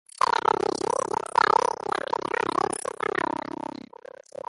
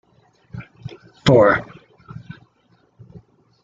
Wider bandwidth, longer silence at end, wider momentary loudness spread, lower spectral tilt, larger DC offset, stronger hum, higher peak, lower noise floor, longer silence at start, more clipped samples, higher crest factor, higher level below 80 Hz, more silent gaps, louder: first, 11.5 kHz vs 7.8 kHz; second, 1.25 s vs 2 s; second, 16 LU vs 27 LU; second, -3 dB/octave vs -7 dB/octave; neither; neither; second, -6 dBFS vs -2 dBFS; second, -46 dBFS vs -60 dBFS; second, 0.2 s vs 0.55 s; neither; about the same, 20 dB vs 20 dB; second, -64 dBFS vs -50 dBFS; neither; second, -26 LUFS vs -16 LUFS